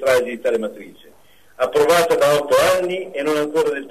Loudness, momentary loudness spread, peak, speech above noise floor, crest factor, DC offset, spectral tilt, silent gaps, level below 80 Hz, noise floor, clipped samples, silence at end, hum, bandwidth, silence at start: -18 LUFS; 9 LU; -4 dBFS; 35 dB; 14 dB; 0.3%; -3.5 dB/octave; none; -54 dBFS; -52 dBFS; under 0.1%; 0 s; none; 13.5 kHz; 0 s